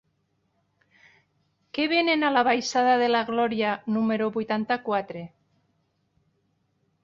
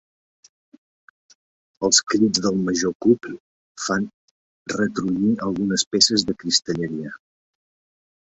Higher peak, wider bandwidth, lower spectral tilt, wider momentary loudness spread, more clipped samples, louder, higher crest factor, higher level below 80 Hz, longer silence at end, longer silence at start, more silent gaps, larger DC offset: second, -10 dBFS vs -2 dBFS; second, 7.6 kHz vs 8.4 kHz; first, -4.5 dB/octave vs -3 dB/octave; second, 9 LU vs 15 LU; neither; second, -24 LUFS vs -20 LUFS; about the same, 18 dB vs 22 dB; second, -70 dBFS vs -58 dBFS; first, 1.75 s vs 1.15 s; about the same, 1.75 s vs 1.8 s; second, none vs 2.95-3.00 s, 3.40-3.75 s, 4.14-4.66 s, 5.86-5.91 s; neither